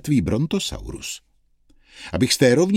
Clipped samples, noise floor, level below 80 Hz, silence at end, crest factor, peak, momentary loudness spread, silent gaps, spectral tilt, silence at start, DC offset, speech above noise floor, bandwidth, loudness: under 0.1%; -58 dBFS; -42 dBFS; 0 s; 18 dB; -2 dBFS; 17 LU; none; -5 dB/octave; 0.05 s; under 0.1%; 37 dB; 16.5 kHz; -21 LUFS